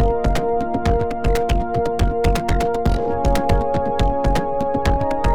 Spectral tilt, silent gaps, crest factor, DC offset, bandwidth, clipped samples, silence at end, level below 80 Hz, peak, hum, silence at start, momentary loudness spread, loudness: -6.5 dB/octave; none; 14 dB; under 0.1%; 15.5 kHz; under 0.1%; 0 s; -22 dBFS; -4 dBFS; none; 0 s; 2 LU; -20 LUFS